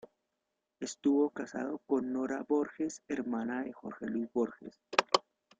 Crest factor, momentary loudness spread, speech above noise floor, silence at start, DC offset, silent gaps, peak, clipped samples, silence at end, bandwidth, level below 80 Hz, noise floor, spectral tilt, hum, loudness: 28 dB; 11 LU; 52 dB; 0.8 s; under 0.1%; none; -8 dBFS; under 0.1%; 0.4 s; 9.4 kHz; -76 dBFS; -86 dBFS; -3.5 dB/octave; none; -34 LUFS